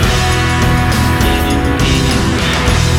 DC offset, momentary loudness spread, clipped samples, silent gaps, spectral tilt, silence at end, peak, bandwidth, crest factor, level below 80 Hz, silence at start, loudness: under 0.1%; 1 LU; under 0.1%; none; -4.5 dB/octave; 0 s; 0 dBFS; 18 kHz; 12 dB; -18 dBFS; 0 s; -12 LUFS